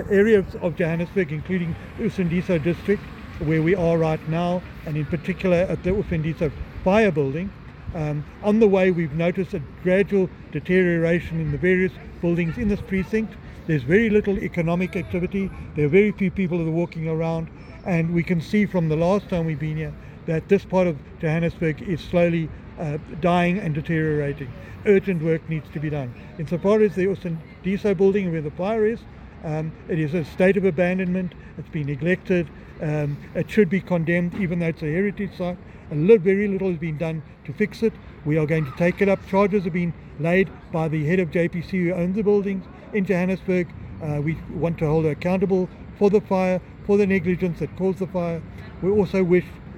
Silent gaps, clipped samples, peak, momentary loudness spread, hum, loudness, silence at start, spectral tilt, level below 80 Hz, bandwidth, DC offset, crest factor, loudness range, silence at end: none; under 0.1%; -4 dBFS; 11 LU; none; -23 LUFS; 0 s; -8.5 dB/octave; -44 dBFS; 9.6 kHz; under 0.1%; 18 dB; 2 LU; 0 s